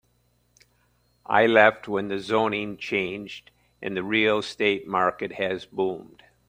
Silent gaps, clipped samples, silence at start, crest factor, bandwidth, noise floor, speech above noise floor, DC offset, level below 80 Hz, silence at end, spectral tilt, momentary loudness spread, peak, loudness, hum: none; under 0.1%; 1.3 s; 24 dB; 16 kHz; -67 dBFS; 43 dB; under 0.1%; -64 dBFS; 0.45 s; -5 dB/octave; 14 LU; -2 dBFS; -24 LUFS; 60 Hz at -60 dBFS